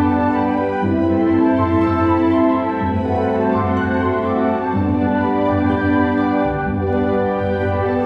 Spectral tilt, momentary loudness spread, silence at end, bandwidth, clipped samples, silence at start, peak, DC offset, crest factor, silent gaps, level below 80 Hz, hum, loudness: -9.5 dB/octave; 4 LU; 0 s; 5.6 kHz; under 0.1%; 0 s; -4 dBFS; under 0.1%; 12 dB; none; -42 dBFS; none; -17 LUFS